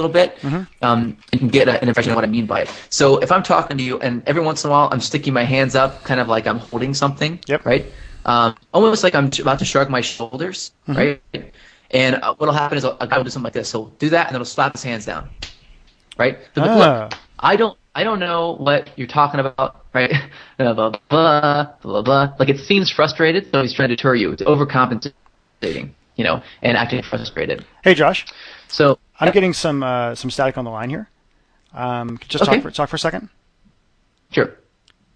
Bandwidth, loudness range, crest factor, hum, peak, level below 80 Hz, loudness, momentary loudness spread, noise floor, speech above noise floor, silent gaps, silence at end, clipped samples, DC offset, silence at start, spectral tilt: 10.5 kHz; 5 LU; 18 dB; none; 0 dBFS; -48 dBFS; -18 LUFS; 11 LU; -61 dBFS; 43 dB; none; 0.65 s; under 0.1%; under 0.1%; 0 s; -5 dB/octave